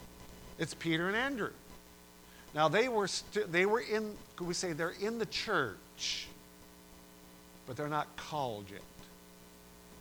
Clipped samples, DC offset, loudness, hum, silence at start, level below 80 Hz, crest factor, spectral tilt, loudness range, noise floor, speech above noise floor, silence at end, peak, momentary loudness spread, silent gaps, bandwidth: under 0.1%; under 0.1%; -35 LUFS; none; 0 s; -62 dBFS; 22 dB; -4 dB/octave; 9 LU; -57 dBFS; 22 dB; 0 s; -16 dBFS; 25 LU; none; over 20 kHz